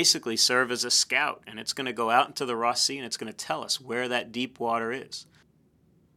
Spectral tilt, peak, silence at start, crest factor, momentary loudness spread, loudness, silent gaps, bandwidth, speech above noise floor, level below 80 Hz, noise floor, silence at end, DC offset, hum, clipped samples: -1 dB/octave; -6 dBFS; 0 s; 22 dB; 12 LU; -26 LUFS; none; 17 kHz; 36 dB; -74 dBFS; -63 dBFS; 0.95 s; under 0.1%; none; under 0.1%